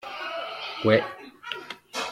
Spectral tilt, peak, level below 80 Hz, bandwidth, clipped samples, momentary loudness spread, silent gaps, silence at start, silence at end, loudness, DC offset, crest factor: -5 dB/octave; -6 dBFS; -68 dBFS; 15 kHz; under 0.1%; 14 LU; none; 0 s; 0 s; -28 LUFS; under 0.1%; 24 dB